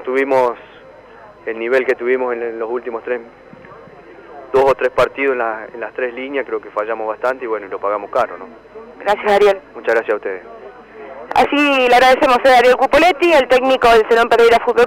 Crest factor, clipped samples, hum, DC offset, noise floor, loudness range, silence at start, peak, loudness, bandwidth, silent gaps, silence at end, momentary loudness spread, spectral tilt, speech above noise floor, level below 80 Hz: 10 dB; under 0.1%; none; under 0.1%; -40 dBFS; 10 LU; 0 s; -6 dBFS; -15 LUFS; 16.5 kHz; none; 0 s; 15 LU; -3.5 dB/octave; 26 dB; -46 dBFS